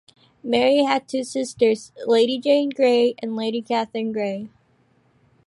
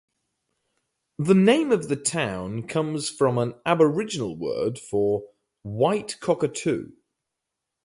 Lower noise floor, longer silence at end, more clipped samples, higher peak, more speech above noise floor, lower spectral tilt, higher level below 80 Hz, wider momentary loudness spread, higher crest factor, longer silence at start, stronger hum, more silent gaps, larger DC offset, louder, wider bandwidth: second, -61 dBFS vs -84 dBFS; about the same, 1 s vs 1 s; neither; about the same, -6 dBFS vs -6 dBFS; second, 41 dB vs 60 dB; about the same, -4.5 dB/octave vs -5.5 dB/octave; second, -68 dBFS vs -60 dBFS; about the same, 9 LU vs 11 LU; about the same, 16 dB vs 20 dB; second, 0.45 s vs 1.2 s; neither; neither; neither; first, -21 LUFS vs -24 LUFS; about the same, 11.5 kHz vs 11.5 kHz